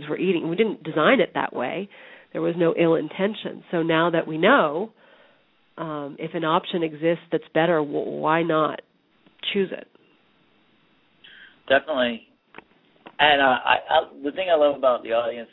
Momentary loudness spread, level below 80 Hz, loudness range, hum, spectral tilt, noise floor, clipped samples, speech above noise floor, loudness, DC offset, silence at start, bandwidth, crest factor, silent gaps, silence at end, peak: 13 LU; -64 dBFS; 7 LU; none; -9 dB/octave; -62 dBFS; under 0.1%; 40 dB; -22 LUFS; under 0.1%; 0 s; 4.1 kHz; 22 dB; none; 0.1 s; -2 dBFS